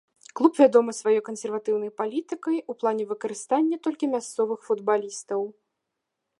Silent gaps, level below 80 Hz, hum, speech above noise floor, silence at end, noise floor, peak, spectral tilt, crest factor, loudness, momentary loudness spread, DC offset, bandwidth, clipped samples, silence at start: none; -84 dBFS; none; 58 dB; 0.9 s; -82 dBFS; -4 dBFS; -4.5 dB/octave; 22 dB; -25 LUFS; 12 LU; under 0.1%; 11.5 kHz; under 0.1%; 0.35 s